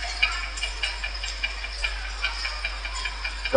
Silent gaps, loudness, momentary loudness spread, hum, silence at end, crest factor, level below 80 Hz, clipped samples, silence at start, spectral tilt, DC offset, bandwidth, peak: none; -28 LUFS; 6 LU; none; 0 s; 26 dB; -34 dBFS; under 0.1%; 0 s; -2 dB/octave; under 0.1%; 10 kHz; -4 dBFS